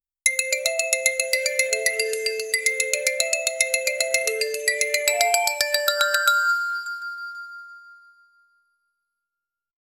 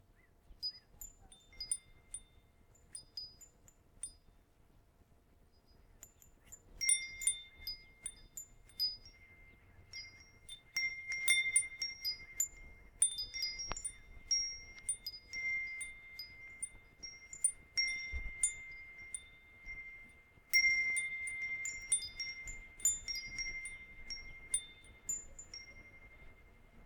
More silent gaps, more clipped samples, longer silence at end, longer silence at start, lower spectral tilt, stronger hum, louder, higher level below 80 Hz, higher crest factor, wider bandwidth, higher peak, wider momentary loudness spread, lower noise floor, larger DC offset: neither; neither; first, 2.05 s vs 0 s; first, 0.25 s vs 0.1 s; second, 3.5 dB/octave vs 2 dB/octave; neither; first, -21 LUFS vs -37 LUFS; second, -70 dBFS vs -60 dBFS; about the same, 24 dB vs 24 dB; second, 16.5 kHz vs 19 kHz; first, -2 dBFS vs -18 dBFS; second, 11 LU vs 21 LU; first, -87 dBFS vs -67 dBFS; neither